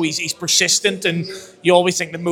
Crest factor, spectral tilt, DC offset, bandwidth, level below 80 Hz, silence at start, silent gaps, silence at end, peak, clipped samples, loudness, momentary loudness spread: 18 dB; -2.5 dB/octave; under 0.1%; 19.5 kHz; -62 dBFS; 0 s; none; 0 s; 0 dBFS; under 0.1%; -17 LUFS; 9 LU